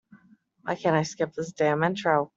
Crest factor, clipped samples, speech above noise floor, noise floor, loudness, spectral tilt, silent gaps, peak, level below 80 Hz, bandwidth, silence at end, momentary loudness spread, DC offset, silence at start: 20 dB; under 0.1%; 34 dB; -59 dBFS; -26 LUFS; -5.5 dB/octave; none; -8 dBFS; -68 dBFS; 8 kHz; 0.1 s; 8 LU; under 0.1%; 0.65 s